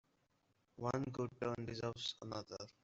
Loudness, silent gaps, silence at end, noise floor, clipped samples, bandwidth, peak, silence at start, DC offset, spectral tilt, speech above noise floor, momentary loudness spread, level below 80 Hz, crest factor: -44 LUFS; none; 0.15 s; -80 dBFS; under 0.1%; 8 kHz; -24 dBFS; 0.75 s; under 0.1%; -4.5 dB/octave; 36 dB; 6 LU; -70 dBFS; 20 dB